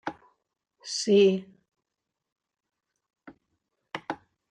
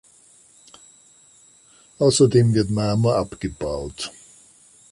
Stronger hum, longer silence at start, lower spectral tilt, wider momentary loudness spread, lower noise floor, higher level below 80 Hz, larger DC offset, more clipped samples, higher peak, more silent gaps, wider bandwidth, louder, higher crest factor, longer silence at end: neither; second, 0.05 s vs 2 s; second, -4.5 dB/octave vs -6 dB/octave; first, 20 LU vs 15 LU; first, -86 dBFS vs -53 dBFS; second, -76 dBFS vs -46 dBFS; neither; neither; second, -10 dBFS vs -4 dBFS; first, 2.32-2.36 s vs none; second, 10 kHz vs 11.5 kHz; second, -25 LUFS vs -20 LUFS; about the same, 20 dB vs 20 dB; second, 0.35 s vs 0.8 s